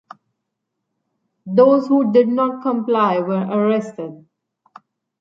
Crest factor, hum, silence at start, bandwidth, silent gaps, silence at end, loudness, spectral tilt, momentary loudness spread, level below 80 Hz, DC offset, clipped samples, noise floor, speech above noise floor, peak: 18 dB; none; 1.45 s; 7.6 kHz; none; 1.05 s; -17 LUFS; -8.5 dB/octave; 11 LU; -68 dBFS; under 0.1%; under 0.1%; -77 dBFS; 61 dB; -2 dBFS